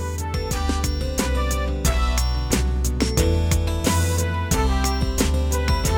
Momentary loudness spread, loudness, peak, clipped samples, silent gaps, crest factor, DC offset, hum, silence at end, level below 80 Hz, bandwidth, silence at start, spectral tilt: 4 LU; -22 LUFS; -6 dBFS; under 0.1%; none; 14 dB; 0.3%; none; 0 s; -24 dBFS; 17 kHz; 0 s; -4.5 dB/octave